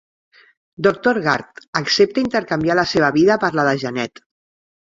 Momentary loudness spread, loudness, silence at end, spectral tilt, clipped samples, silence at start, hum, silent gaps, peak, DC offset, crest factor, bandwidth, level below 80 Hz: 9 LU; -18 LUFS; 0.75 s; -5 dB/octave; under 0.1%; 0.8 s; none; 1.68-1.73 s; 0 dBFS; under 0.1%; 18 dB; 7.8 kHz; -54 dBFS